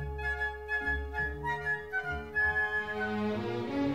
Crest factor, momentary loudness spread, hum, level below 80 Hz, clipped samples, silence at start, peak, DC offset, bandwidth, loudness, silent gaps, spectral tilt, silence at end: 12 dB; 6 LU; none; -44 dBFS; under 0.1%; 0 s; -20 dBFS; 0.1%; 15.5 kHz; -32 LUFS; none; -6.5 dB/octave; 0 s